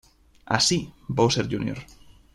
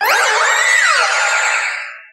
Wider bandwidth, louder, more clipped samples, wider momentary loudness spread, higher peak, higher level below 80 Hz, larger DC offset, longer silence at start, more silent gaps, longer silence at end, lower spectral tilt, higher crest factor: about the same, 15.5 kHz vs 16 kHz; second, -24 LUFS vs -12 LUFS; neither; first, 11 LU vs 7 LU; second, -4 dBFS vs 0 dBFS; first, -52 dBFS vs -80 dBFS; neither; first, 0.45 s vs 0 s; neither; first, 0.5 s vs 0.1 s; first, -4 dB/octave vs 4.5 dB/octave; first, 22 dB vs 14 dB